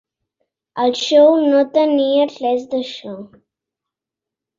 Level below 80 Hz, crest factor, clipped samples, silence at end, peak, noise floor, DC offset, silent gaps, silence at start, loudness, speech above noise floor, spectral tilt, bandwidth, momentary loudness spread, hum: -66 dBFS; 16 dB; under 0.1%; 1.35 s; -2 dBFS; -86 dBFS; under 0.1%; none; 0.75 s; -15 LUFS; 71 dB; -4 dB/octave; 7.6 kHz; 19 LU; none